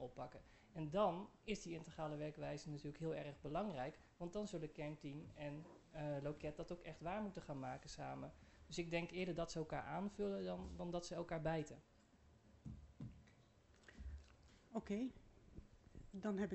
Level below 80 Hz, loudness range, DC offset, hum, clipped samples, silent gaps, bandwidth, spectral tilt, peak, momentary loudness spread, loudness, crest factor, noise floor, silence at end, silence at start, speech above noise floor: -64 dBFS; 7 LU; under 0.1%; none; under 0.1%; none; 8.2 kHz; -6 dB/octave; -26 dBFS; 16 LU; -48 LUFS; 22 dB; -71 dBFS; 0 s; 0 s; 24 dB